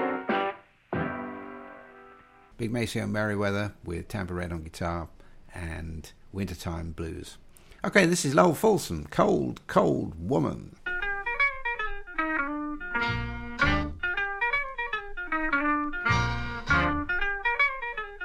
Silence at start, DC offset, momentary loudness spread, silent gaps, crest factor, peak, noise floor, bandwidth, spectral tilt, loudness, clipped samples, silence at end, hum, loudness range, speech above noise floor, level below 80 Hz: 0 s; under 0.1%; 14 LU; none; 22 dB; -6 dBFS; -54 dBFS; 16 kHz; -5 dB/octave; -28 LUFS; under 0.1%; 0 s; none; 9 LU; 26 dB; -42 dBFS